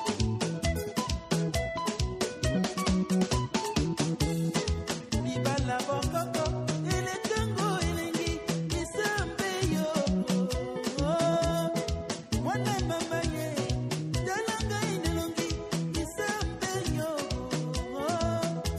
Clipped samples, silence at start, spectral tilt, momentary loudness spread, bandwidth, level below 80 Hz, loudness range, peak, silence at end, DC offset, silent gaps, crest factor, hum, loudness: under 0.1%; 0 s; -5 dB/octave; 4 LU; 15.5 kHz; -40 dBFS; 2 LU; -14 dBFS; 0 s; under 0.1%; none; 16 dB; none; -30 LUFS